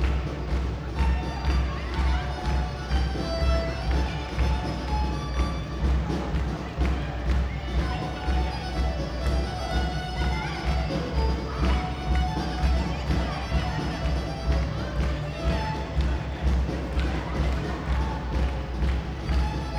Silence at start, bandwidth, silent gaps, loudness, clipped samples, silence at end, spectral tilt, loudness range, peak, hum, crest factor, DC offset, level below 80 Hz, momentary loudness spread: 0 s; 9.4 kHz; none; -28 LUFS; under 0.1%; 0 s; -6.5 dB/octave; 1 LU; -12 dBFS; none; 14 dB; under 0.1%; -28 dBFS; 3 LU